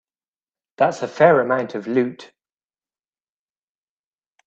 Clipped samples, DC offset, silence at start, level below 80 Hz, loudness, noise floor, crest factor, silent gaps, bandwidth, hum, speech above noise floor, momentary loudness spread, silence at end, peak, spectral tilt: under 0.1%; under 0.1%; 0.8 s; -68 dBFS; -19 LUFS; under -90 dBFS; 20 dB; none; 8.2 kHz; none; over 72 dB; 8 LU; 2.2 s; -2 dBFS; -6.5 dB/octave